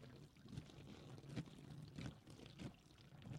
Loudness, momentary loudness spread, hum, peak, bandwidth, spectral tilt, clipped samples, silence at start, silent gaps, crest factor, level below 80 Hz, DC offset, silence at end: -57 LUFS; 9 LU; none; -36 dBFS; 16 kHz; -6 dB/octave; under 0.1%; 0 s; none; 20 dB; -72 dBFS; under 0.1%; 0 s